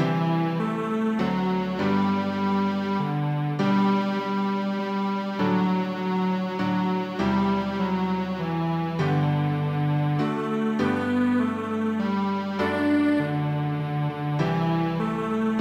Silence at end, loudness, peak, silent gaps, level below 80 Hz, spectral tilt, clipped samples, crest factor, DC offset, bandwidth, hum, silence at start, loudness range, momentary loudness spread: 0 s; -25 LUFS; -12 dBFS; none; -56 dBFS; -8 dB/octave; under 0.1%; 12 dB; under 0.1%; 8.8 kHz; none; 0 s; 1 LU; 4 LU